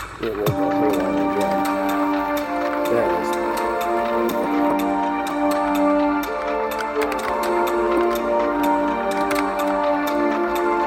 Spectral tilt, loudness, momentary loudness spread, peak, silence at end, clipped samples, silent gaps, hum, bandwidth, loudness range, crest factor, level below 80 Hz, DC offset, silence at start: -5.5 dB/octave; -21 LUFS; 3 LU; -6 dBFS; 0 s; under 0.1%; none; none; 17 kHz; 1 LU; 14 dB; -48 dBFS; under 0.1%; 0 s